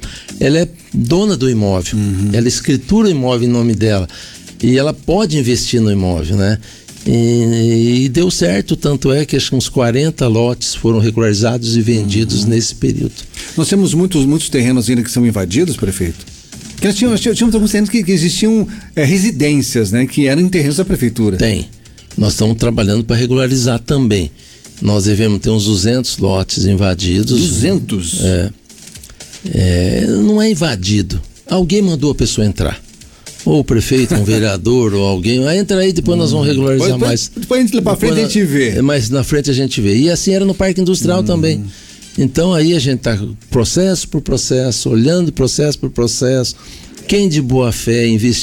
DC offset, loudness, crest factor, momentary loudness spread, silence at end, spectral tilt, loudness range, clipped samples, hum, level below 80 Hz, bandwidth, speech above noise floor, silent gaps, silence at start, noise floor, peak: under 0.1%; -13 LUFS; 10 dB; 7 LU; 0 s; -5.5 dB/octave; 2 LU; under 0.1%; none; -32 dBFS; 18.5 kHz; 23 dB; none; 0 s; -36 dBFS; -4 dBFS